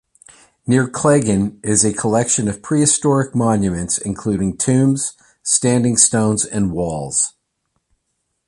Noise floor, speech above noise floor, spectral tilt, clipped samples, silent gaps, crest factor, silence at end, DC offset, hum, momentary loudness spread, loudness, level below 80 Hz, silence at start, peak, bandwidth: -72 dBFS; 55 dB; -4.5 dB/octave; under 0.1%; none; 18 dB; 1.2 s; under 0.1%; none; 7 LU; -16 LUFS; -44 dBFS; 0.65 s; 0 dBFS; 11.5 kHz